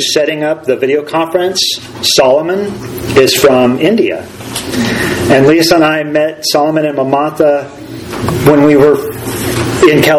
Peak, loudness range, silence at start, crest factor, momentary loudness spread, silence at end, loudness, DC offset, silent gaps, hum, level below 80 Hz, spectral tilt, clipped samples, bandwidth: 0 dBFS; 1 LU; 0 s; 10 dB; 11 LU; 0 s; -10 LUFS; under 0.1%; none; none; -40 dBFS; -4.5 dB/octave; 0.7%; 18.5 kHz